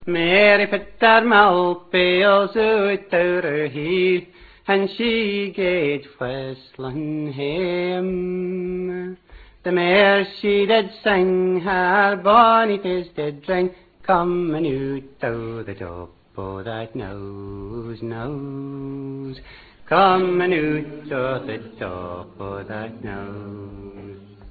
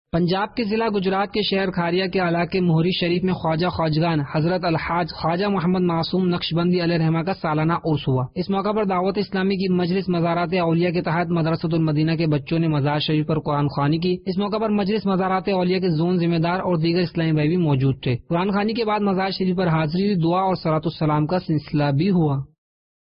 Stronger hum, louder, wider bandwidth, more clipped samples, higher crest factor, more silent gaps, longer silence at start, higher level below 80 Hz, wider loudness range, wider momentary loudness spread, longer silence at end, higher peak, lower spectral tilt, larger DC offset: neither; about the same, -19 LUFS vs -21 LUFS; second, 4.8 kHz vs 5.6 kHz; neither; first, 20 dB vs 10 dB; neither; second, 0 s vs 0.15 s; about the same, -50 dBFS vs -48 dBFS; first, 14 LU vs 1 LU; first, 19 LU vs 3 LU; second, 0 s vs 0.55 s; first, 0 dBFS vs -10 dBFS; second, -8.5 dB/octave vs -12 dB/octave; neither